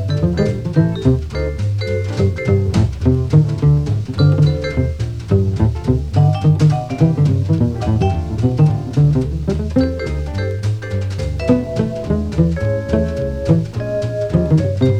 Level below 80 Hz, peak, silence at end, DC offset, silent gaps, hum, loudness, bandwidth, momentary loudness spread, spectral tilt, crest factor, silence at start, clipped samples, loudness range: -28 dBFS; 0 dBFS; 0 s; under 0.1%; none; none; -17 LUFS; 9.2 kHz; 7 LU; -8.5 dB/octave; 14 dB; 0 s; under 0.1%; 3 LU